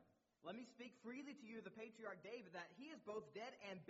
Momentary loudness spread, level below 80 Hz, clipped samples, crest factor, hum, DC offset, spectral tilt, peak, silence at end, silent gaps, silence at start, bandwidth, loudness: 4 LU; under -90 dBFS; under 0.1%; 16 dB; none; under 0.1%; -3.5 dB/octave; -40 dBFS; 0 s; none; 0 s; 7.6 kHz; -56 LUFS